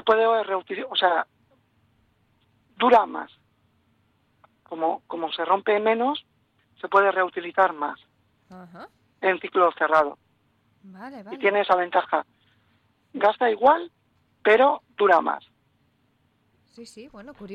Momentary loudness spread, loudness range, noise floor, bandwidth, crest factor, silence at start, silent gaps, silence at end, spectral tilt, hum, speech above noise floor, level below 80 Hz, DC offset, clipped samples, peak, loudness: 22 LU; 5 LU; -67 dBFS; 9.2 kHz; 18 dB; 0.05 s; none; 0 s; -5 dB/octave; none; 44 dB; -70 dBFS; under 0.1%; under 0.1%; -6 dBFS; -22 LUFS